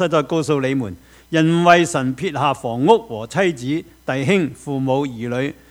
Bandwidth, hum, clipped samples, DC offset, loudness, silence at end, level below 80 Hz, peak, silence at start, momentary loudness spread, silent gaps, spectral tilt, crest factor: 16 kHz; none; under 0.1%; under 0.1%; -19 LUFS; 0.2 s; -54 dBFS; 0 dBFS; 0 s; 10 LU; none; -6 dB/octave; 18 dB